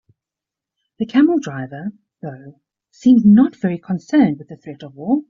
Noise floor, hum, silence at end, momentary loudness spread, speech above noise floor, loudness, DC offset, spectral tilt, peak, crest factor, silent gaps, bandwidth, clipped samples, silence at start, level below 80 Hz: -86 dBFS; none; 0.05 s; 22 LU; 70 dB; -16 LUFS; under 0.1%; -7.5 dB/octave; -4 dBFS; 14 dB; none; 7.4 kHz; under 0.1%; 1 s; -58 dBFS